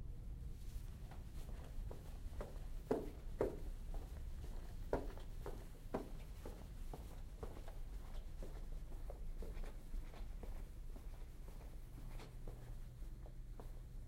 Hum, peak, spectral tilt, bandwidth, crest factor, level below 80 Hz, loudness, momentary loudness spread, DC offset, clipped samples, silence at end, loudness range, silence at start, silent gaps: none; -24 dBFS; -7 dB/octave; 16 kHz; 24 dB; -48 dBFS; -52 LUFS; 12 LU; under 0.1%; under 0.1%; 0 s; 8 LU; 0 s; none